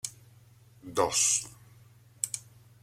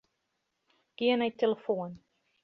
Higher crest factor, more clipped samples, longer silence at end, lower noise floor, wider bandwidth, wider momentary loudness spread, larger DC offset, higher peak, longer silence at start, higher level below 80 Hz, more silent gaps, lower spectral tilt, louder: about the same, 24 dB vs 20 dB; neither; about the same, 0.45 s vs 0.45 s; second, -57 dBFS vs -81 dBFS; first, 16.5 kHz vs 6.2 kHz; first, 19 LU vs 7 LU; neither; first, -10 dBFS vs -14 dBFS; second, 0.05 s vs 1 s; first, -66 dBFS vs -78 dBFS; neither; second, -1 dB/octave vs -7 dB/octave; about the same, -29 LUFS vs -30 LUFS